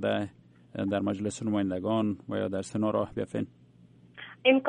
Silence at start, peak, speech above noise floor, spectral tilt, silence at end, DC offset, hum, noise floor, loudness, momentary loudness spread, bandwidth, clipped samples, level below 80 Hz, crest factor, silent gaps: 0 s; -8 dBFS; 27 dB; -6 dB/octave; 0 s; under 0.1%; none; -57 dBFS; -31 LUFS; 12 LU; 10.5 kHz; under 0.1%; -66 dBFS; 22 dB; none